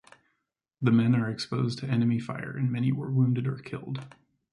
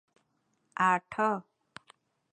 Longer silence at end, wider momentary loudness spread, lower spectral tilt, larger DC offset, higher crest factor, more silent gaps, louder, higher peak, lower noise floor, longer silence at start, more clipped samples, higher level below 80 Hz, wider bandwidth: second, 0.45 s vs 0.9 s; about the same, 13 LU vs 11 LU; first, -8 dB/octave vs -5.5 dB/octave; neither; about the same, 18 dB vs 22 dB; neither; about the same, -28 LUFS vs -29 LUFS; about the same, -10 dBFS vs -12 dBFS; first, -81 dBFS vs -76 dBFS; about the same, 0.8 s vs 0.8 s; neither; first, -64 dBFS vs -78 dBFS; first, 11 kHz vs 9.6 kHz